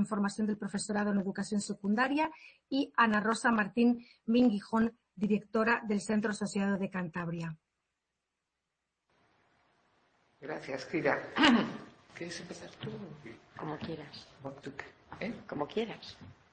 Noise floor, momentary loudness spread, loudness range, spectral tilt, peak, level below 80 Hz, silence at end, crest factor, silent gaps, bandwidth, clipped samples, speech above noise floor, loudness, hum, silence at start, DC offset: -86 dBFS; 19 LU; 14 LU; -5 dB/octave; -10 dBFS; -68 dBFS; 0.2 s; 24 dB; none; 8.8 kHz; under 0.1%; 54 dB; -32 LUFS; none; 0 s; under 0.1%